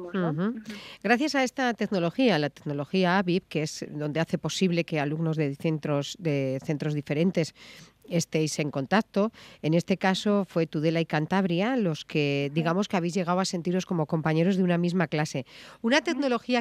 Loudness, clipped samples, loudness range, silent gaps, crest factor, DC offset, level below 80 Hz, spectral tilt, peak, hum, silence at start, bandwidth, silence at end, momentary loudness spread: -27 LUFS; under 0.1%; 2 LU; none; 20 dB; under 0.1%; -68 dBFS; -6 dB/octave; -6 dBFS; none; 0 s; 13.5 kHz; 0 s; 7 LU